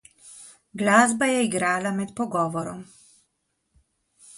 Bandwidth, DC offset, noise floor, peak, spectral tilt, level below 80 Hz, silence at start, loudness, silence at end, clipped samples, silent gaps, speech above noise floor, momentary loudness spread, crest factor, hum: 11.5 kHz; under 0.1%; -75 dBFS; -2 dBFS; -4 dB/octave; -64 dBFS; 0.25 s; -23 LUFS; 0 s; under 0.1%; none; 52 dB; 24 LU; 24 dB; none